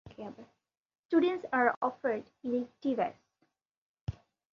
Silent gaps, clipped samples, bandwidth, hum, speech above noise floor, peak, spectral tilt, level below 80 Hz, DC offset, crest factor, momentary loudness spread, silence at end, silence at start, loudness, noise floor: 0.77-0.85 s, 0.99-1.09 s, 1.77-1.81 s, 3.71-3.94 s, 4.01-4.07 s; under 0.1%; 6.8 kHz; none; 46 dB; -12 dBFS; -8 dB/octave; -60 dBFS; under 0.1%; 22 dB; 16 LU; 0.4 s; 0.05 s; -32 LUFS; -78 dBFS